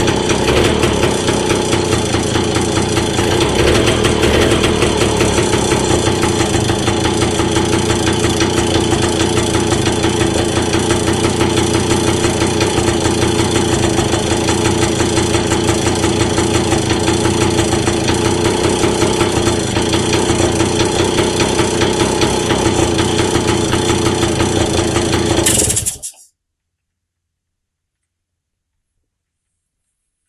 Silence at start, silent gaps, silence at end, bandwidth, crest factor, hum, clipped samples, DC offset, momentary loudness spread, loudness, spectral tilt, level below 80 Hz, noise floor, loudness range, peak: 0 s; none; 4.15 s; 13.5 kHz; 14 dB; none; under 0.1%; under 0.1%; 2 LU; -14 LUFS; -4 dB/octave; -28 dBFS; -75 dBFS; 1 LU; 0 dBFS